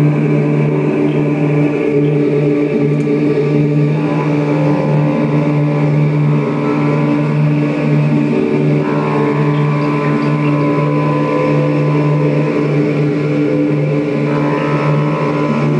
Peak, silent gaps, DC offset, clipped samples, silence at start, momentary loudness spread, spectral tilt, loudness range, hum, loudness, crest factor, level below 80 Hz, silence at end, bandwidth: -2 dBFS; none; under 0.1%; under 0.1%; 0 s; 2 LU; -9 dB/octave; 0 LU; none; -14 LUFS; 12 dB; -50 dBFS; 0 s; 6.6 kHz